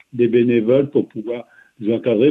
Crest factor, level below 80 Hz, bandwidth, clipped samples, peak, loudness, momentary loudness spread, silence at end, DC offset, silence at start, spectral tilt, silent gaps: 14 dB; -62 dBFS; 3.9 kHz; under 0.1%; -4 dBFS; -18 LUFS; 13 LU; 0 s; under 0.1%; 0.15 s; -9.5 dB/octave; none